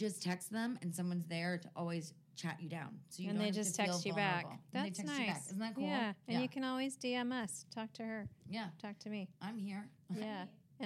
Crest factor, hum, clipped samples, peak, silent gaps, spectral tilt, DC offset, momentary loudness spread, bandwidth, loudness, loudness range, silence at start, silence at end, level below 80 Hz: 20 dB; none; under 0.1%; -22 dBFS; none; -4.5 dB/octave; under 0.1%; 10 LU; 15.5 kHz; -41 LUFS; 5 LU; 0 s; 0 s; -82 dBFS